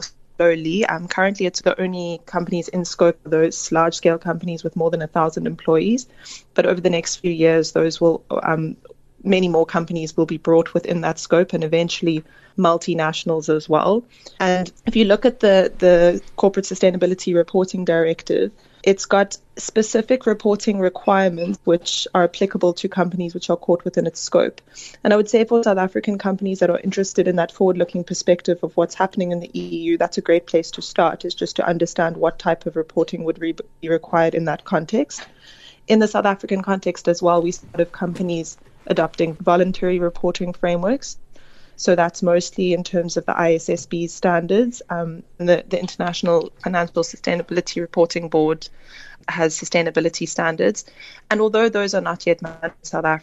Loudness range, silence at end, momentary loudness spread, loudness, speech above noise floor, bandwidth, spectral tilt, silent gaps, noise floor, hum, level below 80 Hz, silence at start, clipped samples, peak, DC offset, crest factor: 4 LU; 0.05 s; 8 LU; -19 LUFS; 22 dB; 8.2 kHz; -5 dB/octave; none; -41 dBFS; none; -48 dBFS; 0 s; under 0.1%; -2 dBFS; under 0.1%; 16 dB